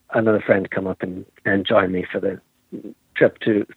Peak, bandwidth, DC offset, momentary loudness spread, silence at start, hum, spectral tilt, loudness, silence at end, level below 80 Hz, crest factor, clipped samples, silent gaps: 0 dBFS; 4.5 kHz; under 0.1%; 19 LU; 0.1 s; none; -8.5 dB/octave; -21 LUFS; 0.05 s; -62 dBFS; 20 dB; under 0.1%; none